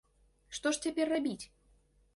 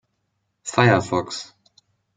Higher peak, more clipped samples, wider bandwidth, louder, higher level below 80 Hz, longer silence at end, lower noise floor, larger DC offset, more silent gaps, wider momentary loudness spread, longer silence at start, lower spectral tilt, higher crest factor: second, -18 dBFS vs -2 dBFS; neither; first, 11.5 kHz vs 9.4 kHz; second, -34 LUFS vs -20 LUFS; second, -68 dBFS vs -62 dBFS; about the same, 0.7 s vs 0.7 s; second, -68 dBFS vs -74 dBFS; neither; neither; second, 13 LU vs 18 LU; second, 0.5 s vs 0.65 s; second, -3 dB/octave vs -5 dB/octave; about the same, 18 dB vs 22 dB